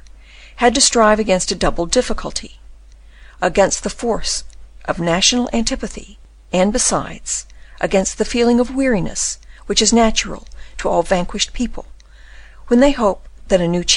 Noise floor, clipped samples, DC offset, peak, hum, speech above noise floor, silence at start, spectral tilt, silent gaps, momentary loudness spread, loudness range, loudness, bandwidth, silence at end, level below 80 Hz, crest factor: -41 dBFS; under 0.1%; under 0.1%; -2 dBFS; none; 25 dB; 0.35 s; -3 dB/octave; none; 13 LU; 2 LU; -17 LUFS; 11 kHz; 0 s; -32 dBFS; 16 dB